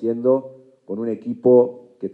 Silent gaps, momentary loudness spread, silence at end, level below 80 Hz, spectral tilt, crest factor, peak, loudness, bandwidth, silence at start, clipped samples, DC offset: none; 15 LU; 0.05 s; -76 dBFS; -11.5 dB/octave; 16 dB; -4 dBFS; -19 LUFS; 2.7 kHz; 0 s; under 0.1%; under 0.1%